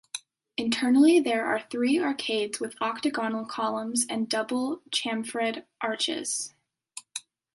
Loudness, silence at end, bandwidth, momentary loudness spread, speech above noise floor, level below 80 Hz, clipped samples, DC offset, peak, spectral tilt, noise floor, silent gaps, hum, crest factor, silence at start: -27 LUFS; 0.35 s; 12 kHz; 17 LU; 22 dB; -76 dBFS; under 0.1%; under 0.1%; -10 dBFS; -2.5 dB/octave; -48 dBFS; none; none; 18 dB; 0.15 s